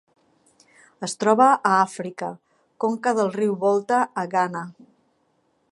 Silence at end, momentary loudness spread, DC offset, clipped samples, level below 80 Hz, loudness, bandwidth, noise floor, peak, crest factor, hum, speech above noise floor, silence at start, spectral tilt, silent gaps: 1 s; 17 LU; under 0.1%; under 0.1%; -76 dBFS; -22 LUFS; 11.5 kHz; -67 dBFS; -4 dBFS; 20 dB; none; 46 dB; 1 s; -5 dB/octave; none